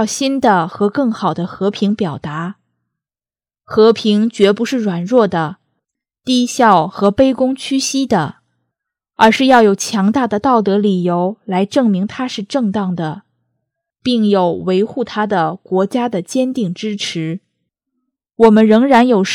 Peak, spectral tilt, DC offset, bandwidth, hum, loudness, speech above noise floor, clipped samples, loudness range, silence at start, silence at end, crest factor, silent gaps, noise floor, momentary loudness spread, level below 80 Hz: 0 dBFS; -5.5 dB/octave; under 0.1%; 14.5 kHz; none; -14 LUFS; over 76 dB; under 0.1%; 4 LU; 0 s; 0 s; 14 dB; none; under -90 dBFS; 11 LU; -52 dBFS